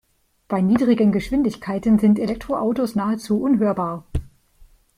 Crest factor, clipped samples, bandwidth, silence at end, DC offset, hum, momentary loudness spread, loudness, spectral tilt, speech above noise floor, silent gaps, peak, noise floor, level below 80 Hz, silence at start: 16 dB; under 0.1%; 14 kHz; 0.35 s; under 0.1%; none; 10 LU; -20 LUFS; -8 dB/octave; 32 dB; none; -6 dBFS; -52 dBFS; -42 dBFS; 0.5 s